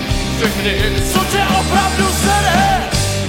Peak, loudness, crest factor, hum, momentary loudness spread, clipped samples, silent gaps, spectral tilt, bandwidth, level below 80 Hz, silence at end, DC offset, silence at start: 0 dBFS; -14 LUFS; 14 dB; none; 4 LU; under 0.1%; none; -4 dB/octave; 16.5 kHz; -24 dBFS; 0 s; under 0.1%; 0 s